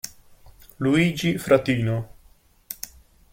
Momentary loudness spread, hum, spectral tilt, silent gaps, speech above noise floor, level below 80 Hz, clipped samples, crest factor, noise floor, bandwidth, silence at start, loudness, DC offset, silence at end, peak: 18 LU; none; -6 dB/octave; none; 35 dB; -52 dBFS; under 0.1%; 22 dB; -56 dBFS; 17 kHz; 0.05 s; -22 LUFS; under 0.1%; 0.45 s; -4 dBFS